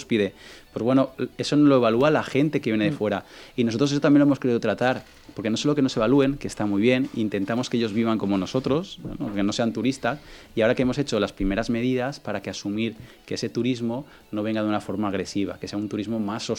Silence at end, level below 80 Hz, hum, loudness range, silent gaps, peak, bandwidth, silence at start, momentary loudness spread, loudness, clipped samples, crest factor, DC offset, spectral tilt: 0 s; -48 dBFS; none; 6 LU; none; -6 dBFS; 12 kHz; 0 s; 11 LU; -24 LUFS; under 0.1%; 18 dB; under 0.1%; -6 dB/octave